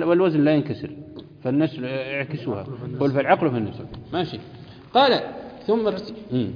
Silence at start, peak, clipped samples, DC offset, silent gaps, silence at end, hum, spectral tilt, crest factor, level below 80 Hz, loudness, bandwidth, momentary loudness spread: 0 s; -4 dBFS; under 0.1%; under 0.1%; none; 0 s; none; -8.5 dB/octave; 18 dB; -56 dBFS; -23 LUFS; 5.2 kHz; 17 LU